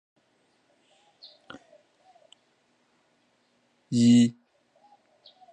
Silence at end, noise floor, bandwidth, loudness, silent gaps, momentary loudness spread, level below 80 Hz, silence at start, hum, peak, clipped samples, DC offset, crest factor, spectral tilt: 1.2 s; -69 dBFS; 9.6 kHz; -22 LUFS; none; 30 LU; -74 dBFS; 3.9 s; none; -10 dBFS; under 0.1%; under 0.1%; 20 dB; -6 dB/octave